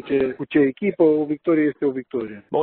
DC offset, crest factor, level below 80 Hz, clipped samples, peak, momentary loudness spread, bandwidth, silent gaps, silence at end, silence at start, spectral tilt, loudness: under 0.1%; 14 dB; -60 dBFS; under 0.1%; -6 dBFS; 10 LU; 4.2 kHz; none; 0 s; 0.05 s; -6.5 dB/octave; -21 LUFS